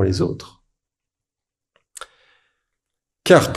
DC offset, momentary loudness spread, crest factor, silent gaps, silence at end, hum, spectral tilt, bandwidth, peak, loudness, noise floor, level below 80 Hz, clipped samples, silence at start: under 0.1%; 28 LU; 22 dB; none; 0 s; none; -5.5 dB/octave; 13.5 kHz; 0 dBFS; -18 LUFS; -87 dBFS; -50 dBFS; under 0.1%; 0 s